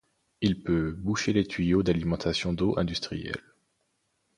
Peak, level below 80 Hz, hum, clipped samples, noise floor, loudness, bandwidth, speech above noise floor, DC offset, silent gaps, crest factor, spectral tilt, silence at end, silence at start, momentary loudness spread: -10 dBFS; -46 dBFS; none; under 0.1%; -75 dBFS; -28 LUFS; 11 kHz; 48 dB; under 0.1%; none; 18 dB; -6 dB/octave; 1 s; 0.4 s; 8 LU